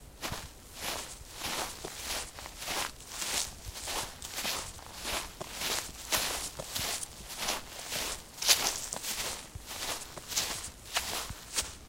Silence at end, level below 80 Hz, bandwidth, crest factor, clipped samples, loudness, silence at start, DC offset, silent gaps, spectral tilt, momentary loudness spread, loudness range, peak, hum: 0 s; -52 dBFS; 16 kHz; 30 dB; under 0.1%; -34 LUFS; 0 s; under 0.1%; none; -0.5 dB/octave; 9 LU; 5 LU; -8 dBFS; none